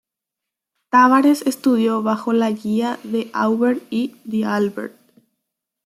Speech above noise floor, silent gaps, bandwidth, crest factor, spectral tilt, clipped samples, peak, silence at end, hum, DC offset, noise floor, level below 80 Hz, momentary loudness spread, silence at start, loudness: 66 dB; none; 14.5 kHz; 18 dB; -5.5 dB/octave; under 0.1%; -2 dBFS; 0.95 s; none; under 0.1%; -84 dBFS; -68 dBFS; 11 LU; 0.95 s; -18 LUFS